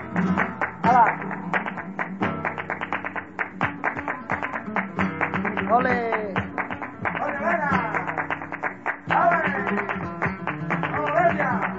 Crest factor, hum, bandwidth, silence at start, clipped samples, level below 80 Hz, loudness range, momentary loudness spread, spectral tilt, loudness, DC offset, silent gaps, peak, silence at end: 20 dB; none; 7.8 kHz; 0 s; under 0.1%; -56 dBFS; 4 LU; 9 LU; -7.5 dB/octave; -25 LUFS; 0.2%; none; -6 dBFS; 0 s